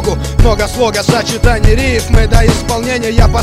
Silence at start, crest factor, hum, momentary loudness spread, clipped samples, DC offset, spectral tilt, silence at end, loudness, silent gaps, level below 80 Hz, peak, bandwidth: 0 s; 10 dB; none; 4 LU; 1%; under 0.1%; -5 dB/octave; 0 s; -12 LUFS; none; -14 dBFS; 0 dBFS; 14.5 kHz